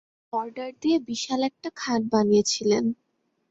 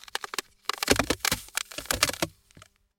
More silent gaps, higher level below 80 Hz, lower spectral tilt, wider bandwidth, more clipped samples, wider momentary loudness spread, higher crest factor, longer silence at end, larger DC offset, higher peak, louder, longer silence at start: neither; second, -66 dBFS vs -46 dBFS; first, -4 dB/octave vs -2 dB/octave; second, 8 kHz vs 17 kHz; neither; first, 12 LU vs 9 LU; second, 18 dB vs 28 dB; first, 0.55 s vs 0.4 s; neither; second, -8 dBFS vs -2 dBFS; first, -25 LUFS vs -28 LUFS; first, 0.35 s vs 0.15 s